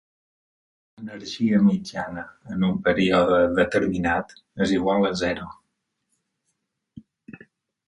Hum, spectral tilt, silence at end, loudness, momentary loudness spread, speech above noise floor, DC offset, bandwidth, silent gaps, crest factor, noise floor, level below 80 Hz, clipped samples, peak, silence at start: none; -6.5 dB/octave; 0.55 s; -22 LUFS; 17 LU; 55 dB; under 0.1%; 11 kHz; none; 18 dB; -77 dBFS; -50 dBFS; under 0.1%; -6 dBFS; 1 s